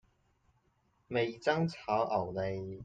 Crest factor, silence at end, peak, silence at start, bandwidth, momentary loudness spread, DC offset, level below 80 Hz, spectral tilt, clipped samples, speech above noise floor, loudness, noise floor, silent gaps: 20 dB; 0 s; -16 dBFS; 1.1 s; 9 kHz; 5 LU; under 0.1%; -66 dBFS; -6.5 dB/octave; under 0.1%; 40 dB; -34 LUFS; -74 dBFS; none